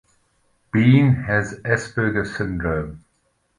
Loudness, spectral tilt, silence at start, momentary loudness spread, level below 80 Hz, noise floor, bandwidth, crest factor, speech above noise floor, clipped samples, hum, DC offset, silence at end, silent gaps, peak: -20 LUFS; -7.5 dB/octave; 0.75 s; 11 LU; -42 dBFS; -67 dBFS; 10.5 kHz; 18 dB; 48 dB; under 0.1%; none; under 0.1%; 0.6 s; none; -4 dBFS